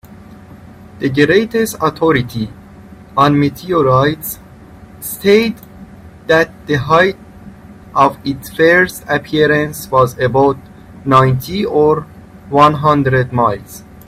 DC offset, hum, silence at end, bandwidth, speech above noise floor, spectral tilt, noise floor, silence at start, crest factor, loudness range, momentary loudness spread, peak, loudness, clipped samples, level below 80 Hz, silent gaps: under 0.1%; none; 0.25 s; 16 kHz; 25 dB; -6 dB/octave; -37 dBFS; 0.05 s; 14 dB; 2 LU; 14 LU; 0 dBFS; -13 LUFS; under 0.1%; -42 dBFS; none